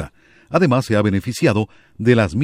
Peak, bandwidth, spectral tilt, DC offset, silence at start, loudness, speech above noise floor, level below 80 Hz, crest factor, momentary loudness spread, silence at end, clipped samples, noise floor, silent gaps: -2 dBFS; 16 kHz; -7 dB/octave; under 0.1%; 0 s; -18 LUFS; 21 dB; -46 dBFS; 16 dB; 7 LU; 0 s; under 0.1%; -37 dBFS; none